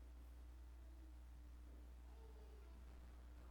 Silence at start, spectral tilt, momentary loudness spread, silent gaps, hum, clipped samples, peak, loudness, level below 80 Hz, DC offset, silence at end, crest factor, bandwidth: 0 s; -6.5 dB/octave; 0 LU; none; none; under 0.1%; -50 dBFS; -62 LUFS; -58 dBFS; under 0.1%; 0 s; 8 dB; 19 kHz